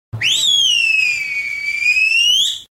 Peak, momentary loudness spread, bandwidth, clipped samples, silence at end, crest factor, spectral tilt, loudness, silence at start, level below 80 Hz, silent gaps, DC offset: -4 dBFS; 8 LU; 16.5 kHz; under 0.1%; 0.1 s; 12 dB; 1.5 dB/octave; -13 LUFS; 0.15 s; -54 dBFS; none; under 0.1%